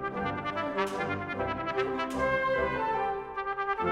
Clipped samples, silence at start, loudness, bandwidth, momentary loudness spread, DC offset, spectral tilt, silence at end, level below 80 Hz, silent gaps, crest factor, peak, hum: under 0.1%; 0 s; -31 LUFS; 14 kHz; 5 LU; under 0.1%; -6 dB/octave; 0 s; -52 dBFS; none; 16 dB; -16 dBFS; none